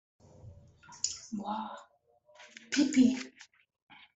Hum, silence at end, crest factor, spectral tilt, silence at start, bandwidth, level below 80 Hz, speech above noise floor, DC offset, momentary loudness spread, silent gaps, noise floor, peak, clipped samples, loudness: none; 0.7 s; 20 dB; -3 dB/octave; 0.45 s; 8.2 kHz; -72 dBFS; 37 dB; under 0.1%; 26 LU; none; -66 dBFS; -14 dBFS; under 0.1%; -31 LUFS